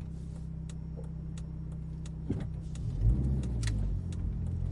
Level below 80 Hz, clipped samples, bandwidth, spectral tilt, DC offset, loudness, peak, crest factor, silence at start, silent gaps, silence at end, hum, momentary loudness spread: -36 dBFS; under 0.1%; 11.5 kHz; -7.5 dB/octave; under 0.1%; -36 LUFS; -16 dBFS; 16 dB; 0 s; none; 0 s; none; 10 LU